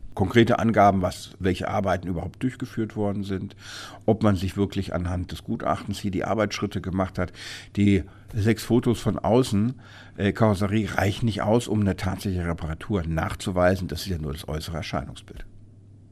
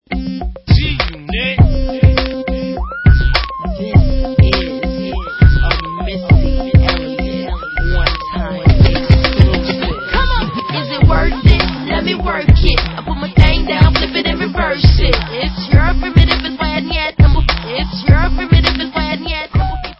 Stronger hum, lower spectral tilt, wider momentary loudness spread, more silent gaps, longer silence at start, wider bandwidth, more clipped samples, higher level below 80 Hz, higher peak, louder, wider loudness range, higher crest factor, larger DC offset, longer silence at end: neither; second, -6.5 dB/octave vs -8 dB/octave; about the same, 11 LU vs 9 LU; neither; about the same, 0 s vs 0.1 s; first, 14.5 kHz vs 5.8 kHz; second, under 0.1% vs 0.3%; second, -44 dBFS vs -16 dBFS; second, -4 dBFS vs 0 dBFS; second, -25 LUFS vs -14 LUFS; about the same, 4 LU vs 2 LU; first, 20 dB vs 12 dB; neither; first, 0.3 s vs 0.05 s